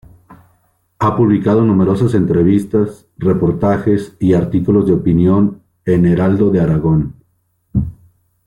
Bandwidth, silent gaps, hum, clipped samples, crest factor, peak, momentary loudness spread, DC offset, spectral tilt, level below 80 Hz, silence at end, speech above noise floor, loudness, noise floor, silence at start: 11 kHz; none; none; under 0.1%; 12 dB; -2 dBFS; 8 LU; under 0.1%; -10 dB/octave; -38 dBFS; 0.5 s; 49 dB; -14 LUFS; -61 dBFS; 0.3 s